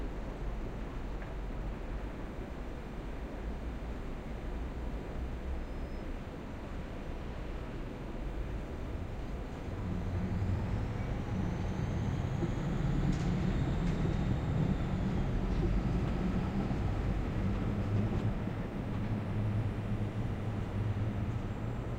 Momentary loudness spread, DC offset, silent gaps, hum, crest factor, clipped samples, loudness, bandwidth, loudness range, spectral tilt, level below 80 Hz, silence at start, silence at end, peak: 10 LU; under 0.1%; none; none; 16 dB; under 0.1%; -37 LUFS; 10 kHz; 9 LU; -8 dB/octave; -40 dBFS; 0 s; 0 s; -20 dBFS